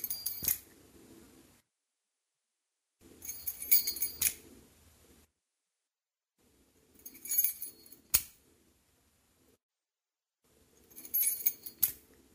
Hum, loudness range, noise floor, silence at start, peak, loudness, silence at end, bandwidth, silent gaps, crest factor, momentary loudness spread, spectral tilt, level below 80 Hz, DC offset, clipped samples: none; 7 LU; under -90 dBFS; 0 s; -6 dBFS; -30 LUFS; 0.35 s; 16 kHz; 9.63-9.69 s; 32 dB; 24 LU; 0.5 dB/octave; -66 dBFS; under 0.1%; under 0.1%